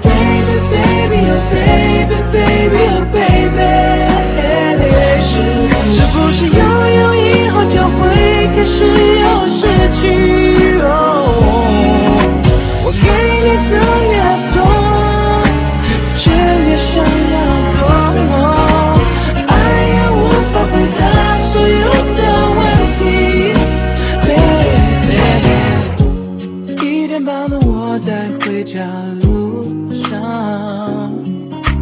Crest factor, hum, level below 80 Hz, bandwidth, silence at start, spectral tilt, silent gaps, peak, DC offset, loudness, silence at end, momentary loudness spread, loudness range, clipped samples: 10 dB; none; -18 dBFS; 4 kHz; 0 s; -11 dB/octave; none; 0 dBFS; under 0.1%; -11 LUFS; 0 s; 8 LU; 6 LU; 0.3%